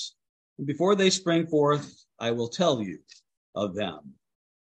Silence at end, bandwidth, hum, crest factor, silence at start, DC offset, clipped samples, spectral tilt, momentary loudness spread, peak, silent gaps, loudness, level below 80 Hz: 0.55 s; 9 kHz; none; 20 dB; 0 s; under 0.1%; under 0.1%; -4.5 dB/octave; 17 LU; -8 dBFS; 0.29-0.56 s, 3.37-3.53 s; -26 LUFS; -70 dBFS